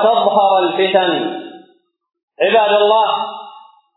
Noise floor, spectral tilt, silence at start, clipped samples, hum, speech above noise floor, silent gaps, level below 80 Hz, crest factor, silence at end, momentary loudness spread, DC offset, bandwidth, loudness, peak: -54 dBFS; -7 dB/octave; 0 s; under 0.1%; none; 40 dB; 2.23-2.28 s; -86 dBFS; 14 dB; 0.35 s; 13 LU; under 0.1%; 4.1 kHz; -14 LUFS; 0 dBFS